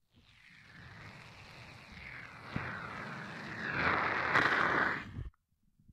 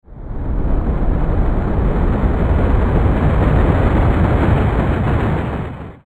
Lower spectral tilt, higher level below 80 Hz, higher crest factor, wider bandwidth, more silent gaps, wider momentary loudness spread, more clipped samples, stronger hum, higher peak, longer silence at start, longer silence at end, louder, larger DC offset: second, -5 dB/octave vs -9.5 dB/octave; second, -60 dBFS vs -18 dBFS; first, 24 dB vs 14 dB; first, 15 kHz vs 4.4 kHz; neither; first, 23 LU vs 8 LU; neither; neither; second, -14 dBFS vs 0 dBFS; first, 0.45 s vs 0.1 s; first, 0.65 s vs 0.15 s; second, -33 LUFS vs -17 LUFS; neither